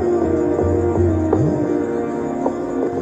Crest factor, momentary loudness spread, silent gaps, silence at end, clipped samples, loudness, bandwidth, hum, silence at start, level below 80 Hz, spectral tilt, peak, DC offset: 14 dB; 5 LU; none; 0 s; under 0.1%; -19 LUFS; 8.2 kHz; none; 0 s; -38 dBFS; -9 dB/octave; -4 dBFS; under 0.1%